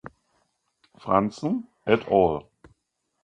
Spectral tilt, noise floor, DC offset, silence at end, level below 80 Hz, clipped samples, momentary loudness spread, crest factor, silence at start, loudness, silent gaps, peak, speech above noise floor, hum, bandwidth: -7.5 dB/octave; -74 dBFS; under 0.1%; 0.85 s; -54 dBFS; under 0.1%; 10 LU; 22 dB; 0.05 s; -24 LUFS; none; -4 dBFS; 51 dB; none; 9.4 kHz